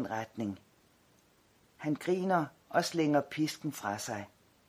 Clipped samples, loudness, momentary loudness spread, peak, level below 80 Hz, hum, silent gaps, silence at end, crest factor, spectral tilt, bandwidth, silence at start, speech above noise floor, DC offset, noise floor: under 0.1%; -34 LUFS; 11 LU; -14 dBFS; -76 dBFS; none; none; 0.4 s; 20 dB; -5 dB/octave; 16 kHz; 0 s; 34 dB; under 0.1%; -67 dBFS